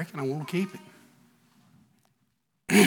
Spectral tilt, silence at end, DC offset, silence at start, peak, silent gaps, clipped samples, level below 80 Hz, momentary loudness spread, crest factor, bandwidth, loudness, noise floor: -4.5 dB/octave; 0 s; under 0.1%; 0 s; -6 dBFS; none; under 0.1%; -76 dBFS; 21 LU; 24 dB; 19 kHz; -30 LUFS; -75 dBFS